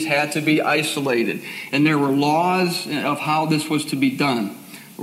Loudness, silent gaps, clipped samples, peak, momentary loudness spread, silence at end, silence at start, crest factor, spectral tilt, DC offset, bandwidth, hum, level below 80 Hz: -20 LUFS; none; under 0.1%; -6 dBFS; 7 LU; 0 s; 0 s; 14 dB; -5 dB/octave; under 0.1%; 16 kHz; none; -74 dBFS